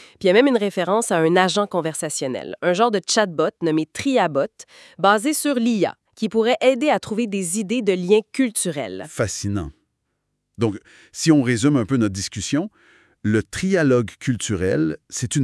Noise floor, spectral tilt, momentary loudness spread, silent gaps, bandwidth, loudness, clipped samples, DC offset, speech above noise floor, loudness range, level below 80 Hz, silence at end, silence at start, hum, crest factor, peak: -74 dBFS; -4.5 dB/octave; 9 LU; none; 12 kHz; -20 LUFS; under 0.1%; under 0.1%; 55 dB; 3 LU; -54 dBFS; 0 s; 0 s; none; 20 dB; -2 dBFS